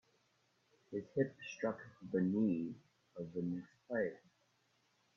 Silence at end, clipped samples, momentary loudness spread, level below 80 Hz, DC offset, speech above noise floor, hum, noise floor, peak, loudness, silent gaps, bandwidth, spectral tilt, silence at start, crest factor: 1 s; under 0.1%; 13 LU; -80 dBFS; under 0.1%; 38 dB; none; -77 dBFS; -22 dBFS; -41 LUFS; none; 7 kHz; -7.5 dB/octave; 0.9 s; 20 dB